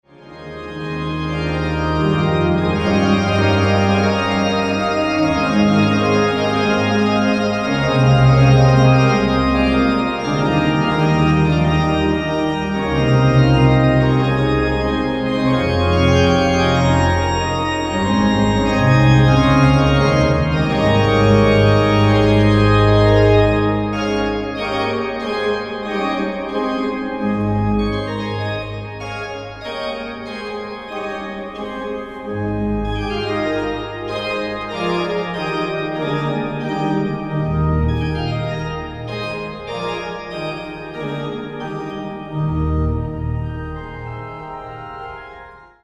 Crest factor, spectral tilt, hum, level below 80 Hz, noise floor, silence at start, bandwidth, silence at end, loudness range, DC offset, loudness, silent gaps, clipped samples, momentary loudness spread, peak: 16 dB; -7 dB/octave; none; -30 dBFS; -40 dBFS; 0.2 s; 9 kHz; 0.25 s; 11 LU; under 0.1%; -17 LUFS; none; under 0.1%; 14 LU; 0 dBFS